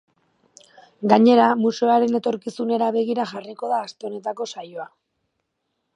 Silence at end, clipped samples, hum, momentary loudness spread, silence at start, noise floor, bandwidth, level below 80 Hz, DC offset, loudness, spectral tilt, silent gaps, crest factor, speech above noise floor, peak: 1.1 s; under 0.1%; none; 17 LU; 1 s; -76 dBFS; 8.6 kHz; -74 dBFS; under 0.1%; -20 LUFS; -6 dB/octave; none; 22 dB; 56 dB; 0 dBFS